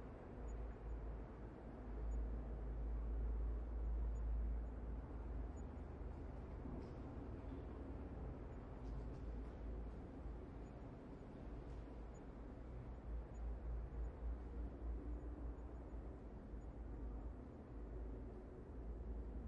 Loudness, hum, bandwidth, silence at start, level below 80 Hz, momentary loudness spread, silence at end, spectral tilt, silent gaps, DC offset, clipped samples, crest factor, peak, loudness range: -52 LUFS; none; 7.2 kHz; 0 s; -50 dBFS; 9 LU; 0 s; -9 dB/octave; none; under 0.1%; under 0.1%; 12 dB; -36 dBFS; 6 LU